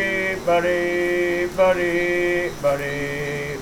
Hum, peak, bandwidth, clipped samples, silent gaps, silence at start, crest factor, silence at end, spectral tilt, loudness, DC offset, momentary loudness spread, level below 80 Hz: none; -8 dBFS; 18.5 kHz; under 0.1%; none; 0 s; 14 dB; 0 s; -5 dB/octave; -21 LUFS; under 0.1%; 7 LU; -44 dBFS